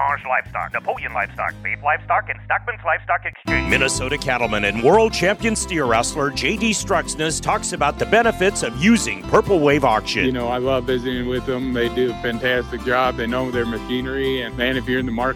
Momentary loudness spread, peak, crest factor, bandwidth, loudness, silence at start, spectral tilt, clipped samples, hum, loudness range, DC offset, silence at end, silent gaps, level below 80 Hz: 7 LU; -2 dBFS; 16 dB; 16 kHz; -20 LUFS; 0 s; -4 dB/octave; under 0.1%; none; 4 LU; under 0.1%; 0 s; none; -38 dBFS